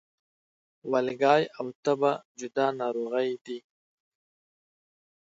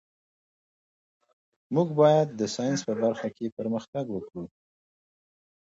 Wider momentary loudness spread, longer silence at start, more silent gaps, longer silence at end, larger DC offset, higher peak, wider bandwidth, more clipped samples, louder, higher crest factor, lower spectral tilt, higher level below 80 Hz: about the same, 14 LU vs 15 LU; second, 0.85 s vs 1.7 s; first, 1.75-1.83 s, 2.25-2.35 s, 3.41-3.45 s vs 3.52-3.57 s, 3.88-3.93 s; first, 1.8 s vs 1.3 s; neither; about the same, -8 dBFS vs -8 dBFS; about the same, 7.8 kHz vs 7.8 kHz; neither; about the same, -28 LUFS vs -27 LUFS; about the same, 22 dB vs 20 dB; about the same, -5.5 dB/octave vs -6 dB/octave; second, -82 dBFS vs -70 dBFS